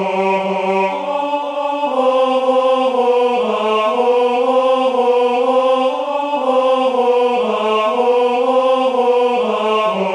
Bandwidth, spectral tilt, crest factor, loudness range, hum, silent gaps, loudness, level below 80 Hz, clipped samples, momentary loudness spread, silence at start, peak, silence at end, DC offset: 10 kHz; -5 dB/octave; 12 dB; 1 LU; none; none; -15 LUFS; -68 dBFS; under 0.1%; 4 LU; 0 s; -2 dBFS; 0 s; under 0.1%